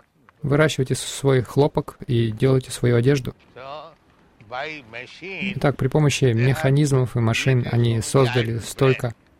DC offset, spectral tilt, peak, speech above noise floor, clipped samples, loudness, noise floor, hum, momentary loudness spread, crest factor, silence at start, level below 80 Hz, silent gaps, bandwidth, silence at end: under 0.1%; -6 dB/octave; -6 dBFS; 34 dB; under 0.1%; -21 LUFS; -55 dBFS; none; 16 LU; 16 dB; 0.45 s; -46 dBFS; none; 15 kHz; 0.25 s